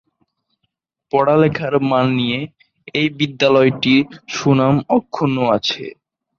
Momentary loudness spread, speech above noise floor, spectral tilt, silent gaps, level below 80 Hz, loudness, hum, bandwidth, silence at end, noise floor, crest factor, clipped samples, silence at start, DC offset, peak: 11 LU; 57 dB; -6 dB/octave; none; -56 dBFS; -17 LUFS; none; 7.2 kHz; 0.5 s; -73 dBFS; 16 dB; under 0.1%; 1.15 s; under 0.1%; -2 dBFS